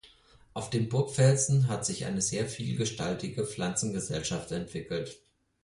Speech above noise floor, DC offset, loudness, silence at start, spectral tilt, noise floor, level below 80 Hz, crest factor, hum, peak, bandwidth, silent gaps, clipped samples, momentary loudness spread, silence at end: 29 dB; under 0.1%; -30 LUFS; 0.05 s; -5 dB/octave; -59 dBFS; -58 dBFS; 18 dB; none; -12 dBFS; 11.5 kHz; none; under 0.1%; 12 LU; 0.45 s